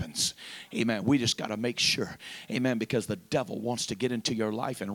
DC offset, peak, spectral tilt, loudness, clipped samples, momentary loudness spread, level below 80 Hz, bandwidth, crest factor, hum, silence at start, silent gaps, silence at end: under 0.1%; -12 dBFS; -3.5 dB/octave; -29 LUFS; under 0.1%; 8 LU; -64 dBFS; 19 kHz; 18 dB; none; 0 s; none; 0 s